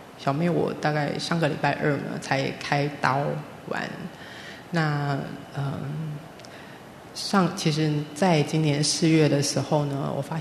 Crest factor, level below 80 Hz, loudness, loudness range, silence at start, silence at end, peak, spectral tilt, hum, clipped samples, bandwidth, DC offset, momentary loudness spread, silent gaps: 22 dB; -62 dBFS; -25 LUFS; 8 LU; 0 s; 0 s; -4 dBFS; -5 dB/octave; none; under 0.1%; 13.5 kHz; under 0.1%; 17 LU; none